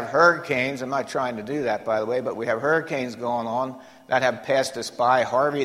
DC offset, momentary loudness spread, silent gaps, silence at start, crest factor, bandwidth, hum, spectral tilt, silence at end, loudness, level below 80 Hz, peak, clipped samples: under 0.1%; 8 LU; none; 0 s; 20 dB; 15.5 kHz; none; -4.5 dB/octave; 0 s; -24 LUFS; -66 dBFS; -4 dBFS; under 0.1%